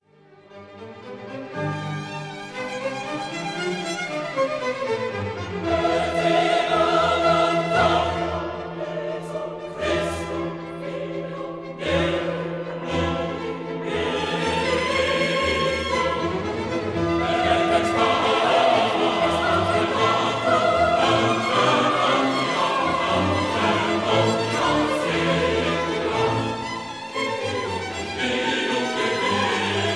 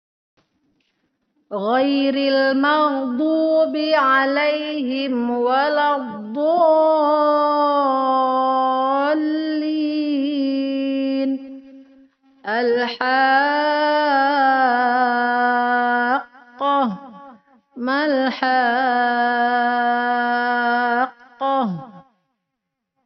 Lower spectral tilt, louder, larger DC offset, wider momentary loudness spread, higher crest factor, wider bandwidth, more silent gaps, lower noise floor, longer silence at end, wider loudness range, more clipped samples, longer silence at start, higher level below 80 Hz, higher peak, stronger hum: first, -4.5 dB/octave vs -1.5 dB/octave; second, -22 LUFS vs -18 LUFS; neither; first, 11 LU vs 7 LU; about the same, 16 dB vs 14 dB; first, 11 kHz vs 6 kHz; neither; second, -52 dBFS vs -79 dBFS; second, 0 s vs 1.05 s; first, 8 LU vs 4 LU; neither; second, 0.5 s vs 1.5 s; first, -46 dBFS vs -72 dBFS; about the same, -6 dBFS vs -4 dBFS; neither